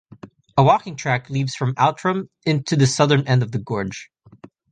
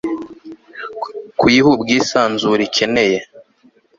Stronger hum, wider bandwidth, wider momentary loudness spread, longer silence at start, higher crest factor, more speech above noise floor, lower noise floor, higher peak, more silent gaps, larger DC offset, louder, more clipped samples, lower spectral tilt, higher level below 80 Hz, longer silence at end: neither; first, 9.6 kHz vs 7.8 kHz; second, 9 LU vs 19 LU; first, 0.25 s vs 0.05 s; about the same, 18 dB vs 16 dB; second, 28 dB vs 39 dB; second, -47 dBFS vs -53 dBFS; about the same, -2 dBFS vs -2 dBFS; neither; neither; second, -20 LUFS vs -15 LUFS; neither; first, -5.5 dB/octave vs -4 dB/octave; about the same, -54 dBFS vs -52 dBFS; second, 0.25 s vs 0.6 s